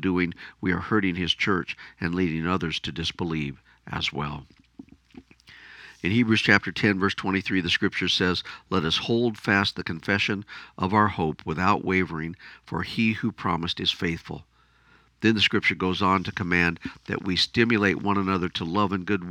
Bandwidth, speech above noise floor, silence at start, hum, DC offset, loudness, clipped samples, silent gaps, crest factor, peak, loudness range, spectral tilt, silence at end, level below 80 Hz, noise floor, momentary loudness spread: 11 kHz; 34 dB; 0 s; none; under 0.1%; -25 LUFS; under 0.1%; none; 26 dB; 0 dBFS; 6 LU; -5.5 dB/octave; 0 s; -52 dBFS; -59 dBFS; 12 LU